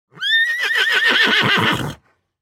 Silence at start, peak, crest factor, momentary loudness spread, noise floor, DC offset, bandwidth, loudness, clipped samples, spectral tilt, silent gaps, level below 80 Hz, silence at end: 0.15 s; -2 dBFS; 16 dB; 7 LU; -44 dBFS; under 0.1%; 17 kHz; -15 LUFS; under 0.1%; -3 dB/octave; none; -52 dBFS; 0.45 s